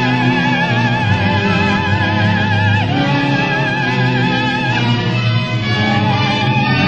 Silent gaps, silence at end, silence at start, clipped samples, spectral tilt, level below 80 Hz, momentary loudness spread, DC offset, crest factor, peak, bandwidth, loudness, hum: none; 0 s; 0 s; under 0.1%; -6.5 dB/octave; -42 dBFS; 2 LU; under 0.1%; 12 dB; -2 dBFS; 8 kHz; -14 LUFS; none